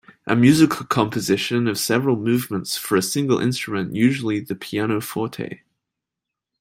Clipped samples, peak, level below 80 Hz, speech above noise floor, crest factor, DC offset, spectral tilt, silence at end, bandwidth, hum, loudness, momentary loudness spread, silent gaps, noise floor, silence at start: under 0.1%; -2 dBFS; -58 dBFS; 65 dB; 18 dB; under 0.1%; -5 dB/octave; 1.05 s; 16.5 kHz; none; -20 LUFS; 10 LU; none; -85 dBFS; 0.25 s